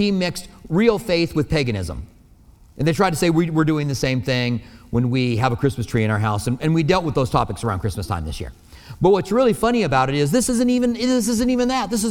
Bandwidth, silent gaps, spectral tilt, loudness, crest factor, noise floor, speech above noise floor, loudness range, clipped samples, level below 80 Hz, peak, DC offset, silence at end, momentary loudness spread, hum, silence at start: 17 kHz; none; -5.5 dB/octave; -20 LUFS; 16 dB; -49 dBFS; 29 dB; 3 LU; under 0.1%; -40 dBFS; -2 dBFS; under 0.1%; 0 s; 8 LU; none; 0 s